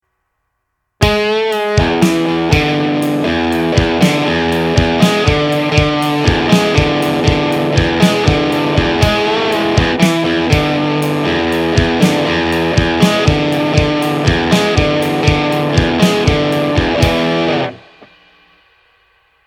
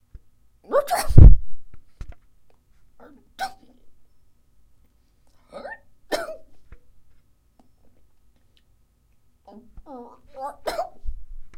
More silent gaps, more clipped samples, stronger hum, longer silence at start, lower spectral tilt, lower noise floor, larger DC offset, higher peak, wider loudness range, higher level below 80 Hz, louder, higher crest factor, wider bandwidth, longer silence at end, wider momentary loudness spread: neither; second, under 0.1% vs 0.2%; neither; first, 1 s vs 0.7 s; second, -5.5 dB/octave vs -7 dB/octave; first, -70 dBFS vs -60 dBFS; neither; about the same, 0 dBFS vs 0 dBFS; second, 2 LU vs 21 LU; about the same, -28 dBFS vs -26 dBFS; first, -13 LUFS vs -21 LUFS; second, 14 dB vs 20 dB; first, 17.5 kHz vs 15.5 kHz; first, 1.7 s vs 0.1 s; second, 3 LU vs 32 LU